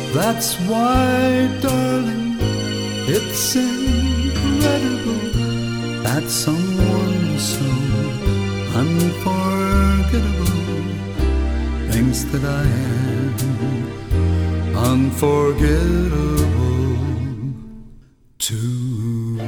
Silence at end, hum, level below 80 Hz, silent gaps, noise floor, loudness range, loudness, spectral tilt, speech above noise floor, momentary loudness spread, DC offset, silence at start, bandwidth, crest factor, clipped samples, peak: 0 s; none; -26 dBFS; none; -45 dBFS; 2 LU; -19 LUFS; -5.5 dB/octave; 28 dB; 6 LU; under 0.1%; 0 s; over 20 kHz; 16 dB; under 0.1%; -2 dBFS